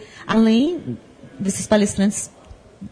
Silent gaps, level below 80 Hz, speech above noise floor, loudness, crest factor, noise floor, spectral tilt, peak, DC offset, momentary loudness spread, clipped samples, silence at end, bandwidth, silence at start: none; -48 dBFS; 21 dB; -19 LUFS; 16 dB; -39 dBFS; -5 dB/octave; -4 dBFS; under 0.1%; 17 LU; under 0.1%; 0.05 s; 11 kHz; 0 s